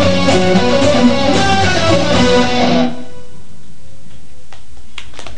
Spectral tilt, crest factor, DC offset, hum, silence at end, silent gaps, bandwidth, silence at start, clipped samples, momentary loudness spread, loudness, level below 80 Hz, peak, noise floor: -5 dB/octave; 16 dB; 20%; none; 0 s; none; 10 kHz; 0 s; under 0.1%; 20 LU; -12 LUFS; -32 dBFS; 0 dBFS; -41 dBFS